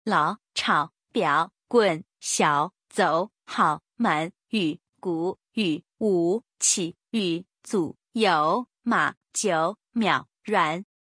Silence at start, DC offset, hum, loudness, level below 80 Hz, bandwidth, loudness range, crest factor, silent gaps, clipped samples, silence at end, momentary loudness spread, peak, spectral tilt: 0.05 s; under 0.1%; none; -25 LUFS; -74 dBFS; 10.5 kHz; 2 LU; 20 dB; 4.89-4.93 s, 9.17-9.21 s; under 0.1%; 0.25 s; 8 LU; -6 dBFS; -3.5 dB/octave